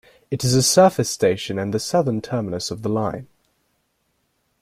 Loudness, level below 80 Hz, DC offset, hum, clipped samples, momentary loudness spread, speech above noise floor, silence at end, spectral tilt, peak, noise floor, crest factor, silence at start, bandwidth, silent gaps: -20 LUFS; -56 dBFS; under 0.1%; none; under 0.1%; 12 LU; 50 dB; 1.35 s; -4.5 dB/octave; -2 dBFS; -69 dBFS; 18 dB; 0.3 s; 16 kHz; none